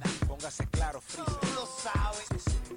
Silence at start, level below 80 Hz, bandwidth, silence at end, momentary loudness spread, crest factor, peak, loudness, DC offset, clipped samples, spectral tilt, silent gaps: 0 s; -36 dBFS; 16 kHz; 0 s; 4 LU; 12 dB; -20 dBFS; -34 LUFS; under 0.1%; under 0.1%; -4.5 dB/octave; none